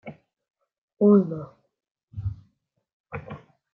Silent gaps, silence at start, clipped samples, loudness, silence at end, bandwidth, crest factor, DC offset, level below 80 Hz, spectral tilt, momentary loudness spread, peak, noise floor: 0.78-0.88 s, 1.91-1.95 s, 2.03-2.08 s, 2.93-3.04 s; 0.05 s; under 0.1%; -23 LUFS; 0.35 s; 3.1 kHz; 20 dB; under 0.1%; -54 dBFS; -12 dB/octave; 26 LU; -6 dBFS; -70 dBFS